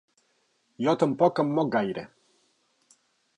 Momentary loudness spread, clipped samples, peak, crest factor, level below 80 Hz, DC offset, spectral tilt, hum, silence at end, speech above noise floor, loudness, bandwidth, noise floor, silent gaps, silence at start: 13 LU; under 0.1%; -8 dBFS; 20 dB; -72 dBFS; under 0.1%; -7 dB/octave; none; 1.3 s; 46 dB; -26 LUFS; 10 kHz; -71 dBFS; none; 0.8 s